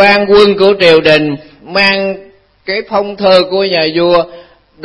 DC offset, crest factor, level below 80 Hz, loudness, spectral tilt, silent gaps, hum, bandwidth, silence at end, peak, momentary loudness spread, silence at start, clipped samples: under 0.1%; 10 dB; -44 dBFS; -9 LUFS; -5.5 dB/octave; none; none; 11 kHz; 0.45 s; 0 dBFS; 13 LU; 0 s; 0.6%